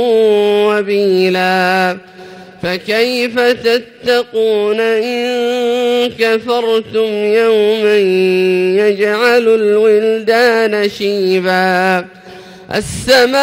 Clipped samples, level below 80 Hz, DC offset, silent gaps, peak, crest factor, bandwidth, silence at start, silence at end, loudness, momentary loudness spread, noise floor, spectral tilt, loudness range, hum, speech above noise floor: under 0.1%; -48 dBFS; under 0.1%; none; 0 dBFS; 12 dB; 16.5 kHz; 0 s; 0 s; -12 LUFS; 6 LU; -34 dBFS; -4.5 dB/octave; 3 LU; none; 22 dB